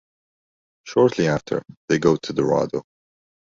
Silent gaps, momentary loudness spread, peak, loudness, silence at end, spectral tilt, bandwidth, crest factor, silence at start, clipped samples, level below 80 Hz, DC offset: 1.77-1.88 s; 10 LU; -4 dBFS; -21 LUFS; 0.6 s; -6 dB/octave; 7.6 kHz; 20 dB; 0.85 s; under 0.1%; -54 dBFS; under 0.1%